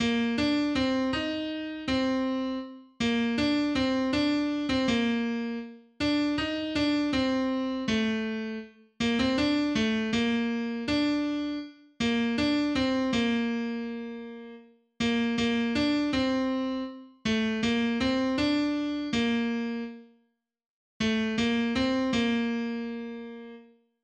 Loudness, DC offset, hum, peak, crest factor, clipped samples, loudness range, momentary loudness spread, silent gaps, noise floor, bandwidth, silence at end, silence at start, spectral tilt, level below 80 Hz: -28 LUFS; under 0.1%; none; -14 dBFS; 14 dB; under 0.1%; 2 LU; 10 LU; 20.66-21.00 s; -72 dBFS; 9.4 kHz; 0.4 s; 0 s; -5 dB/octave; -52 dBFS